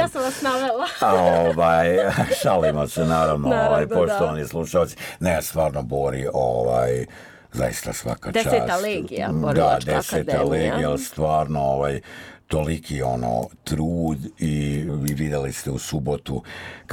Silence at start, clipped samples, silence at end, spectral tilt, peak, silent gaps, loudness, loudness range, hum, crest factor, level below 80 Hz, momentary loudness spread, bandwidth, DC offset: 0 s; under 0.1%; 0 s; -5.5 dB/octave; -6 dBFS; none; -22 LUFS; 6 LU; none; 16 dB; -40 dBFS; 9 LU; 19 kHz; under 0.1%